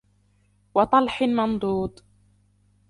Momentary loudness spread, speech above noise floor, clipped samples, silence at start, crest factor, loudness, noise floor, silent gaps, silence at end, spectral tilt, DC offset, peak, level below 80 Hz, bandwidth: 8 LU; 41 dB; under 0.1%; 0.75 s; 20 dB; -23 LUFS; -63 dBFS; none; 1 s; -7 dB/octave; under 0.1%; -6 dBFS; -52 dBFS; 11.5 kHz